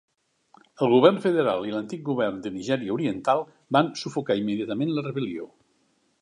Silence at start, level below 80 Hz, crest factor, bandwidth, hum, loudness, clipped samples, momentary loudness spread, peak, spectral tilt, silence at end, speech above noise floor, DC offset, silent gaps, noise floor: 0.8 s; -68 dBFS; 22 dB; 11 kHz; none; -25 LUFS; under 0.1%; 12 LU; -4 dBFS; -6.5 dB/octave; 0.75 s; 44 dB; under 0.1%; none; -68 dBFS